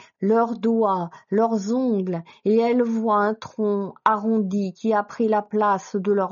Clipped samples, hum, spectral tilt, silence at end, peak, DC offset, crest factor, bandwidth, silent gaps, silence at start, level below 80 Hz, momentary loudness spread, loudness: under 0.1%; none; -6.5 dB/octave; 0 s; -2 dBFS; under 0.1%; 20 dB; 7.2 kHz; none; 0.2 s; -74 dBFS; 5 LU; -22 LUFS